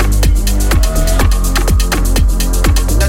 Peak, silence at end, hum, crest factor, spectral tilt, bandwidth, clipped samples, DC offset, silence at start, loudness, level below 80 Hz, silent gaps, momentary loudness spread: -2 dBFS; 0 s; none; 10 dB; -4.5 dB/octave; 16.5 kHz; under 0.1%; under 0.1%; 0 s; -14 LUFS; -12 dBFS; none; 1 LU